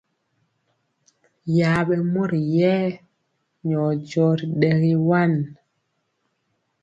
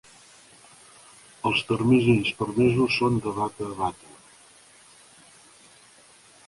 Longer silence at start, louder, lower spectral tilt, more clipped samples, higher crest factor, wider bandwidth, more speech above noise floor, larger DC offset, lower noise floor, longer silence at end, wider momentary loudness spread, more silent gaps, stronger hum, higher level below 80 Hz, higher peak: about the same, 1.45 s vs 1.45 s; first, -21 LUFS vs -24 LUFS; first, -8.5 dB/octave vs -6 dB/octave; neither; about the same, 18 dB vs 18 dB; second, 7.8 kHz vs 11.5 kHz; first, 53 dB vs 31 dB; neither; first, -73 dBFS vs -54 dBFS; second, 1.3 s vs 2.55 s; about the same, 9 LU vs 11 LU; neither; neither; about the same, -60 dBFS vs -56 dBFS; first, -4 dBFS vs -8 dBFS